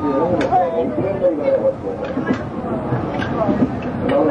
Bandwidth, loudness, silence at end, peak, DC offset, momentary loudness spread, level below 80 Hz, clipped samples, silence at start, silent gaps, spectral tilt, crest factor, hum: 9.4 kHz; -19 LUFS; 0 s; -4 dBFS; under 0.1%; 6 LU; -42 dBFS; under 0.1%; 0 s; none; -8.5 dB/octave; 14 dB; none